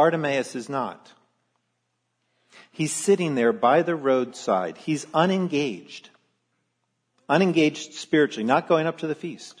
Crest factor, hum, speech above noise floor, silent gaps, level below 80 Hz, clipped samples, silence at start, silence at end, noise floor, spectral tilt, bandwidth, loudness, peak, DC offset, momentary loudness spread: 18 dB; none; 52 dB; none; -78 dBFS; under 0.1%; 0 s; 0.1 s; -76 dBFS; -5 dB/octave; 11 kHz; -23 LUFS; -6 dBFS; under 0.1%; 11 LU